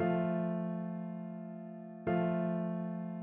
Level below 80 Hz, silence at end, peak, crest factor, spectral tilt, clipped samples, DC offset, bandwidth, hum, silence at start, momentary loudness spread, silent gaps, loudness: -72 dBFS; 0 s; -22 dBFS; 14 dB; -8.5 dB/octave; under 0.1%; under 0.1%; 3.6 kHz; none; 0 s; 12 LU; none; -37 LUFS